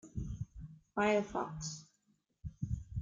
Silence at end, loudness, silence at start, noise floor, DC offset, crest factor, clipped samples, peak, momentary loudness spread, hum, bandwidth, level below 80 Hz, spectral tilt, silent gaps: 0 s; -38 LUFS; 0.05 s; -77 dBFS; under 0.1%; 20 dB; under 0.1%; -20 dBFS; 19 LU; none; 9.4 kHz; -52 dBFS; -5.5 dB/octave; none